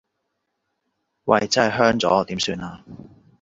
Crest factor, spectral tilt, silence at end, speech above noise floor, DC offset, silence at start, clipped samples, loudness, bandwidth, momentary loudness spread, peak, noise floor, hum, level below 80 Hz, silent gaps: 22 dB; -4 dB/octave; 0.45 s; 56 dB; under 0.1%; 1.25 s; under 0.1%; -20 LUFS; 8 kHz; 15 LU; -2 dBFS; -76 dBFS; none; -54 dBFS; none